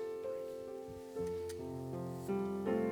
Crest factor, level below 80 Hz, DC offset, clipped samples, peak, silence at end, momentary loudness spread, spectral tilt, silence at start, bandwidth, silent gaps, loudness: 18 dB; -66 dBFS; under 0.1%; under 0.1%; -22 dBFS; 0 s; 9 LU; -7.5 dB/octave; 0 s; over 20 kHz; none; -41 LUFS